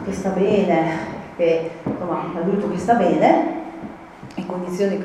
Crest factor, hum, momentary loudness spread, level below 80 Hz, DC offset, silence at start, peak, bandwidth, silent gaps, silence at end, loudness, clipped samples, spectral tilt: 20 dB; none; 16 LU; -52 dBFS; under 0.1%; 0 s; 0 dBFS; 12 kHz; none; 0 s; -20 LUFS; under 0.1%; -7 dB/octave